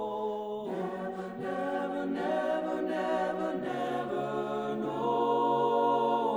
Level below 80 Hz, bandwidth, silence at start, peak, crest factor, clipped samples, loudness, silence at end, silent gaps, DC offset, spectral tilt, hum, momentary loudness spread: -68 dBFS; over 20 kHz; 0 s; -16 dBFS; 16 dB; under 0.1%; -31 LUFS; 0 s; none; under 0.1%; -6.5 dB/octave; none; 9 LU